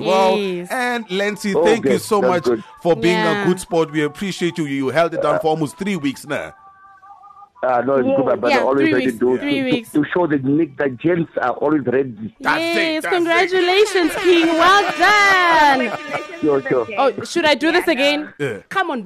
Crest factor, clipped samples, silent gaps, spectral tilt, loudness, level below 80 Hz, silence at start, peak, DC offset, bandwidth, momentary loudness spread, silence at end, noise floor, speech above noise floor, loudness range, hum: 12 dB; under 0.1%; none; -4.5 dB/octave; -17 LUFS; -54 dBFS; 0 s; -4 dBFS; under 0.1%; 13 kHz; 9 LU; 0 s; -45 dBFS; 28 dB; 7 LU; none